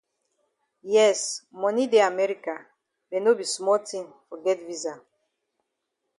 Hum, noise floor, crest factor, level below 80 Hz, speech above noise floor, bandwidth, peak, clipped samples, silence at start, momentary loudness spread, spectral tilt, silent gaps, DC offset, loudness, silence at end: none; -80 dBFS; 18 dB; -80 dBFS; 56 dB; 11.5 kHz; -8 dBFS; under 0.1%; 0.85 s; 15 LU; -2.5 dB/octave; none; under 0.1%; -24 LUFS; 1.2 s